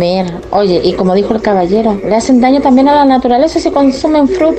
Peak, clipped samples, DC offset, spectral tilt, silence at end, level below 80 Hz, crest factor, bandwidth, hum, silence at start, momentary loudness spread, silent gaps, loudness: 0 dBFS; under 0.1%; 0.2%; -6 dB/octave; 0 s; -36 dBFS; 8 dB; 8.8 kHz; none; 0 s; 5 LU; none; -10 LUFS